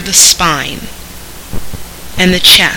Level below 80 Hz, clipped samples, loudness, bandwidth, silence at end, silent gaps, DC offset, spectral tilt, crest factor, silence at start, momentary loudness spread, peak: -30 dBFS; 2%; -7 LUFS; over 20 kHz; 0 s; none; under 0.1%; -1 dB/octave; 12 dB; 0 s; 24 LU; 0 dBFS